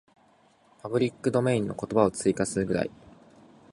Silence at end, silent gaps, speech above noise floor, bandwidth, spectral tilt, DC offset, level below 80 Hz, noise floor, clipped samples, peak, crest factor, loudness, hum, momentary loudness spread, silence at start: 0.85 s; none; 35 dB; 11.5 kHz; -6 dB/octave; under 0.1%; -58 dBFS; -62 dBFS; under 0.1%; -6 dBFS; 22 dB; -27 LUFS; none; 6 LU; 0.85 s